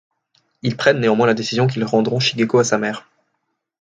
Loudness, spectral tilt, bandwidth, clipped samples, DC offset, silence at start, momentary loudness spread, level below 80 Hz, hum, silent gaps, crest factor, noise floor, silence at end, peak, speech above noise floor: -18 LUFS; -5 dB/octave; 9.2 kHz; under 0.1%; under 0.1%; 0.65 s; 10 LU; -60 dBFS; none; none; 18 dB; -73 dBFS; 0.8 s; 0 dBFS; 56 dB